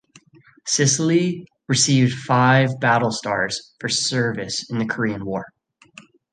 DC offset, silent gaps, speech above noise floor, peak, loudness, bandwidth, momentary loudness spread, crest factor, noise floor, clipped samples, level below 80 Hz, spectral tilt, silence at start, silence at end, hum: under 0.1%; none; 32 dB; -4 dBFS; -20 LUFS; 10 kHz; 11 LU; 18 dB; -52 dBFS; under 0.1%; -58 dBFS; -4 dB/octave; 0.65 s; 0.85 s; none